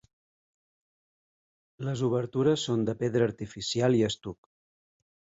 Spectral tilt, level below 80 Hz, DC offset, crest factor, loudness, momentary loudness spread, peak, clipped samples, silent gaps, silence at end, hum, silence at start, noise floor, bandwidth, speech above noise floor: -6 dB/octave; -62 dBFS; under 0.1%; 18 dB; -28 LUFS; 11 LU; -12 dBFS; under 0.1%; none; 1.05 s; none; 1.8 s; under -90 dBFS; 8 kHz; over 62 dB